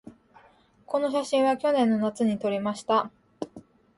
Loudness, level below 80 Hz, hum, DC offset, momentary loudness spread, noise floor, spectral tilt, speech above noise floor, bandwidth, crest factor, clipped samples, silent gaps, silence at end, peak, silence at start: -25 LUFS; -68 dBFS; none; under 0.1%; 17 LU; -59 dBFS; -5.5 dB/octave; 34 dB; 11.5 kHz; 16 dB; under 0.1%; none; 0.35 s; -10 dBFS; 0.05 s